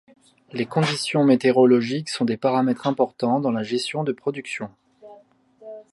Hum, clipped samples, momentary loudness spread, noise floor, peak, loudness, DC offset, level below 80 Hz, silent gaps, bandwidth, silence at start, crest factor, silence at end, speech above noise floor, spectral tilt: none; under 0.1%; 15 LU; -53 dBFS; -4 dBFS; -22 LUFS; under 0.1%; -70 dBFS; none; 11.5 kHz; 0.55 s; 18 dB; 0.1 s; 32 dB; -6 dB/octave